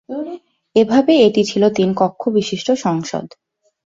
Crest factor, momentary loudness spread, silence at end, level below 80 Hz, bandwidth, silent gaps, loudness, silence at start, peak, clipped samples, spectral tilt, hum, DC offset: 16 dB; 15 LU; 0.7 s; -60 dBFS; 7.8 kHz; none; -16 LUFS; 0.1 s; 0 dBFS; under 0.1%; -5.5 dB/octave; none; under 0.1%